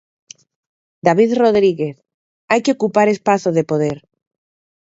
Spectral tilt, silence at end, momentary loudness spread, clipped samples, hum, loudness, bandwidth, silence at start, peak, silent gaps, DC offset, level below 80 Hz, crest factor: -6 dB/octave; 0.95 s; 9 LU; under 0.1%; none; -16 LUFS; 8 kHz; 1.05 s; 0 dBFS; 2.14-2.48 s; under 0.1%; -60 dBFS; 18 dB